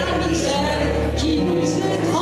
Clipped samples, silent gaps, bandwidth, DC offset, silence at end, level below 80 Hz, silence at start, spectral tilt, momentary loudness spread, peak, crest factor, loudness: under 0.1%; none; 14 kHz; under 0.1%; 0 s; -32 dBFS; 0 s; -5 dB/octave; 1 LU; -10 dBFS; 10 dB; -20 LUFS